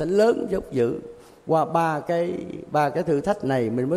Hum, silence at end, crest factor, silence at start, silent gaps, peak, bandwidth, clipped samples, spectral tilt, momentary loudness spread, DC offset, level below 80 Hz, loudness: none; 0 s; 16 dB; 0 s; none; -8 dBFS; 13.5 kHz; under 0.1%; -7 dB/octave; 10 LU; under 0.1%; -54 dBFS; -24 LUFS